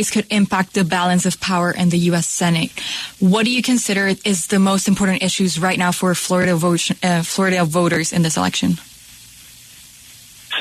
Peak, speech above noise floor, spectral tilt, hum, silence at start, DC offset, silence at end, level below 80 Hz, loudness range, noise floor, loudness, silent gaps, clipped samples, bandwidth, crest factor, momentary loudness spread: -4 dBFS; 25 dB; -4.5 dB/octave; none; 0 s; under 0.1%; 0 s; -52 dBFS; 2 LU; -42 dBFS; -17 LUFS; none; under 0.1%; 13.5 kHz; 14 dB; 3 LU